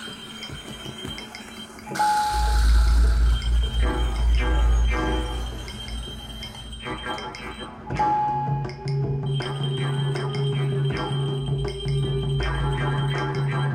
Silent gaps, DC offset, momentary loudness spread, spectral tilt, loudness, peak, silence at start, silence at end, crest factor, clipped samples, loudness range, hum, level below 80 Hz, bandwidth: none; under 0.1%; 13 LU; -5.5 dB/octave; -25 LUFS; -10 dBFS; 0 s; 0 s; 14 dB; under 0.1%; 6 LU; none; -26 dBFS; 13 kHz